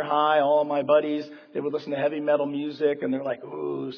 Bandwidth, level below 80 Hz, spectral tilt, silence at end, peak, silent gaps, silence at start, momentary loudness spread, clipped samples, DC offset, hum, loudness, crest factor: 5.4 kHz; -82 dBFS; -7.5 dB/octave; 0 s; -8 dBFS; none; 0 s; 11 LU; under 0.1%; under 0.1%; none; -25 LUFS; 16 dB